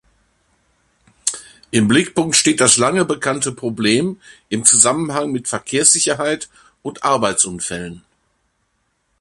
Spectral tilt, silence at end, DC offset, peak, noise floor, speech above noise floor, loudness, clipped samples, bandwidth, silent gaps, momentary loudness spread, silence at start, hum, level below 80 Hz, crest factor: -2.5 dB/octave; 1.25 s; under 0.1%; 0 dBFS; -67 dBFS; 50 dB; -15 LUFS; under 0.1%; 13.5 kHz; none; 14 LU; 1.25 s; none; -54 dBFS; 18 dB